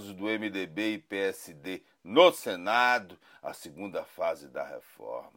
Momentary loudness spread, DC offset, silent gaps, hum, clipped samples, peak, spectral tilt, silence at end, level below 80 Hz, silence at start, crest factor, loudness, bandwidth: 20 LU; under 0.1%; none; none; under 0.1%; -6 dBFS; -3.5 dB/octave; 0.1 s; -78 dBFS; 0 s; 26 dB; -28 LUFS; 16 kHz